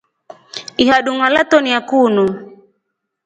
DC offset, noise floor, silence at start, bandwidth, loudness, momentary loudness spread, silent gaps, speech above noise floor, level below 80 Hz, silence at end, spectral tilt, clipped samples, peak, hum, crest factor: under 0.1%; -72 dBFS; 0.55 s; 9.2 kHz; -14 LUFS; 17 LU; none; 59 dB; -54 dBFS; 0.7 s; -4.5 dB/octave; under 0.1%; 0 dBFS; none; 16 dB